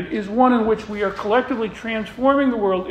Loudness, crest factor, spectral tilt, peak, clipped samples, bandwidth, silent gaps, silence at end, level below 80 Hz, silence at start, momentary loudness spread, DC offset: -20 LUFS; 16 dB; -6.5 dB/octave; -4 dBFS; under 0.1%; 9 kHz; none; 0 s; -48 dBFS; 0 s; 8 LU; under 0.1%